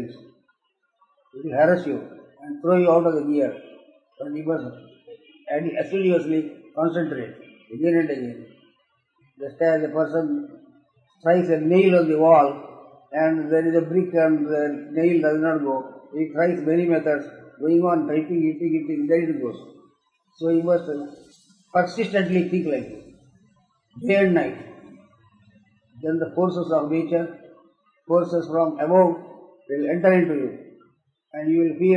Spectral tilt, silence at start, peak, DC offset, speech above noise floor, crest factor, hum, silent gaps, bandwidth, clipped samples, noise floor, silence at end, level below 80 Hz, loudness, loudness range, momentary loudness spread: -8.5 dB/octave; 0 s; -4 dBFS; under 0.1%; 51 dB; 18 dB; none; none; 7.6 kHz; under 0.1%; -72 dBFS; 0 s; -70 dBFS; -22 LUFS; 6 LU; 16 LU